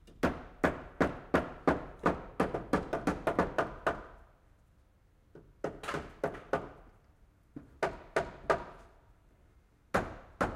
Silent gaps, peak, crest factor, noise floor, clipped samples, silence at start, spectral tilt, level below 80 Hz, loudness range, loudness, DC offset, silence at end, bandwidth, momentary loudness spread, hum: none; -12 dBFS; 24 dB; -65 dBFS; under 0.1%; 0.05 s; -6.5 dB/octave; -52 dBFS; 9 LU; -35 LUFS; under 0.1%; 0 s; 16 kHz; 11 LU; none